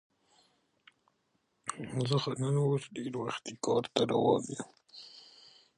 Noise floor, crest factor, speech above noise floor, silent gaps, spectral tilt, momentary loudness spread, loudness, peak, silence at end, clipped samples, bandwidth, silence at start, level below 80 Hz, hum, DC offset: -77 dBFS; 24 dB; 45 dB; none; -5.5 dB/octave; 21 LU; -33 LUFS; -10 dBFS; 0.55 s; under 0.1%; 11 kHz; 1.65 s; -72 dBFS; none; under 0.1%